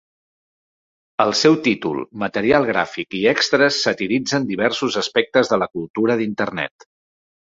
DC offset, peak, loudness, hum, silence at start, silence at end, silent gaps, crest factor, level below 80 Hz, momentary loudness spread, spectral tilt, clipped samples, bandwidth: under 0.1%; -2 dBFS; -19 LUFS; none; 1.2 s; 0.8 s; 5.90-5.94 s; 18 dB; -56 dBFS; 9 LU; -4 dB/octave; under 0.1%; 7.8 kHz